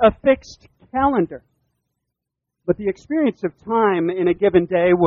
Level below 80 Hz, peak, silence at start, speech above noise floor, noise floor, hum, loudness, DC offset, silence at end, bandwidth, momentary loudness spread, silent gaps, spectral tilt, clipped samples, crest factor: -48 dBFS; -2 dBFS; 0 s; 63 dB; -81 dBFS; none; -20 LUFS; under 0.1%; 0 s; 7 kHz; 11 LU; none; -8 dB/octave; under 0.1%; 18 dB